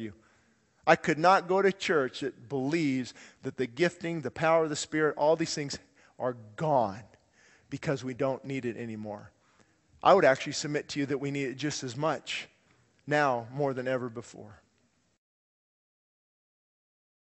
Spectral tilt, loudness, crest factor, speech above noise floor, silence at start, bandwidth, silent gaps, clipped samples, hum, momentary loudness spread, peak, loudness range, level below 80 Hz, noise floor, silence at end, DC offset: -5 dB/octave; -29 LUFS; 26 dB; 42 dB; 0 s; 8.2 kHz; none; under 0.1%; none; 17 LU; -6 dBFS; 6 LU; -70 dBFS; -71 dBFS; 2.75 s; under 0.1%